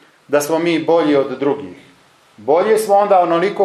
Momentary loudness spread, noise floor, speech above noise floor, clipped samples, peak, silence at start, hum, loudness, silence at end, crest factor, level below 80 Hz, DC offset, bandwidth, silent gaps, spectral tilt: 9 LU; -49 dBFS; 35 dB; under 0.1%; -2 dBFS; 0.3 s; none; -15 LUFS; 0 s; 14 dB; -70 dBFS; under 0.1%; 14.5 kHz; none; -5 dB/octave